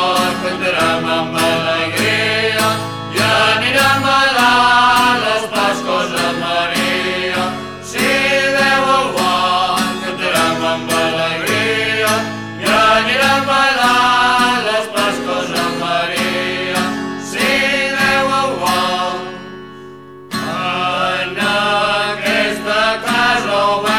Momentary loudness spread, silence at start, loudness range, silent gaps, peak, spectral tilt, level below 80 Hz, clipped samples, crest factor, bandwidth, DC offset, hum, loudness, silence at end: 8 LU; 0 s; 5 LU; none; -2 dBFS; -3 dB/octave; -46 dBFS; under 0.1%; 14 dB; 18 kHz; 0.3%; none; -14 LUFS; 0 s